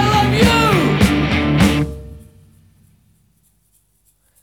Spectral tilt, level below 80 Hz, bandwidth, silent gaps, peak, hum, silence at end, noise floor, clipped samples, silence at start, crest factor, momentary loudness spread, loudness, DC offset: -5.5 dB/octave; -30 dBFS; 18.5 kHz; none; 0 dBFS; none; 2.25 s; -60 dBFS; under 0.1%; 0 s; 18 dB; 9 LU; -14 LUFS; under 0.1%